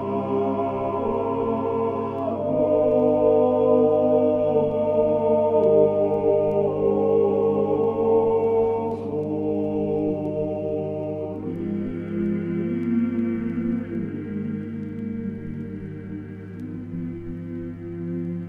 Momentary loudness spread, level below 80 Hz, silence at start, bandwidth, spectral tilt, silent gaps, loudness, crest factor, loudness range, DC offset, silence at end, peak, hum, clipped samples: 14 LU; -52 dBFS; 0 s; 3.6 kHz; -10.5 dB/octave; none; -23 LUFS; 16 dB; 12 LU; under 0.1%; 0 s; -6 dBFS; 50 Hz at -40 dBFS; under 0.1%